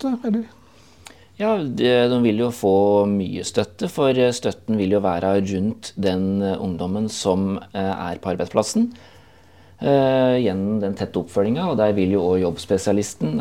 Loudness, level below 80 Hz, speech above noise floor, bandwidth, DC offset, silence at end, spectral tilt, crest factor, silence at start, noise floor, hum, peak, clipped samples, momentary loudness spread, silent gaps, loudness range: -21 LUFS; -58 dBFS; 30 dB; 15.5 kHz; 0.2%; 0 s; -6 dB/octave; 18 dB; 0 s; -50 dBFS; none; -2 dBFS; under 0.1%; 8 LU; none; 4 LU